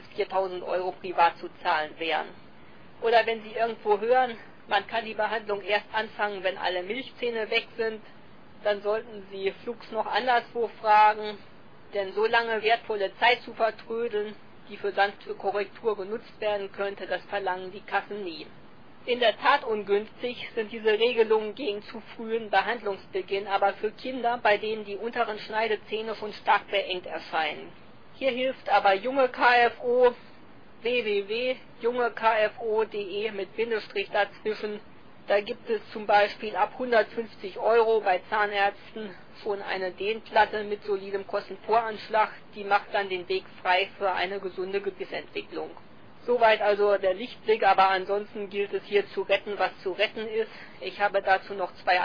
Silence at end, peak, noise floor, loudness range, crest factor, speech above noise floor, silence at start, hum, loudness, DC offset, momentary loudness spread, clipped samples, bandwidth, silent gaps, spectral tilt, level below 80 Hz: 0 s; -8 dBFS; -52 dBFS; 5 LU; 20 dB; 25 dB; 0 s; none; -27 LUFS; 0.4%; 12 LU; under 0.1%; 5.4 kHz; none; -5.5 dB/octave; -64 dBFS